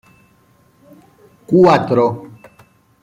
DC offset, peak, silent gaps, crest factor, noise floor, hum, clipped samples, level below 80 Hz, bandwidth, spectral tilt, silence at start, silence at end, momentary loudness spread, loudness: under 0.1%; -2 dBFS; none; 16 dB; -53 dBFS; none; under 0.1%; -56 dBFS; 9.4 kHz; -8 dB/octave; 1.5 s; 0.75 s; 10 LU; -13 LUFS